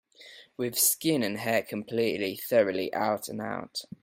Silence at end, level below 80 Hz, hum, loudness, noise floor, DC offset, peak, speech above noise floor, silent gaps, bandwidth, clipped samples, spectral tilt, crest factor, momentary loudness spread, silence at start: 0.15 s; -72 dBFS; none; -28 LUFS; -52 dBFS; under 0.1%; -10 dBFS; 24 dB; none; 16.5 kHz; under 0.1%; -3 dB/octave; 18 dB; 12 LU; 0.2 s